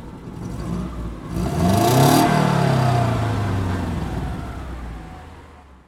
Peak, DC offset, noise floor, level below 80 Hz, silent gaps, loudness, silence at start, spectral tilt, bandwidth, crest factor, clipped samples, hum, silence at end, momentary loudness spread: -2 dBFS; under 0.1%; -44 dBFS; -34 dBFS; none; -20 LUFS; 0 s; -6 dB/octave; 17 kHz; 20 dB; under 0.1%; none; 0.25 s; 19 LU